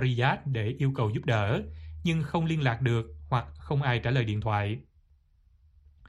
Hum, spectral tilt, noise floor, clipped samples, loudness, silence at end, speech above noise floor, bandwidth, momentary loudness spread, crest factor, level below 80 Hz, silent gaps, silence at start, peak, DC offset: none; -7.5 dB/octave; -63 dBFS; under 0.1%; -29 LUFS; 0 s; 35 dB; 10.5 kHz; 6 LU; 18 dB; -50 dBFS; none; 0 s; -12 dBFS; under 0.1%